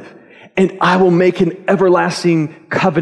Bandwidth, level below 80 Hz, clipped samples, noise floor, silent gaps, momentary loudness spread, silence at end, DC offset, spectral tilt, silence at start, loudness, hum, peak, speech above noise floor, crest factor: 11 kHz; -54 dBFS; under 0.1%; -41 dBFS; none; 6 LU; 0 s; under 0.1%; -6.5 dB/octave; 0 s; -14 LUFS; none; -2 dBFS; 28 dB; 12 dB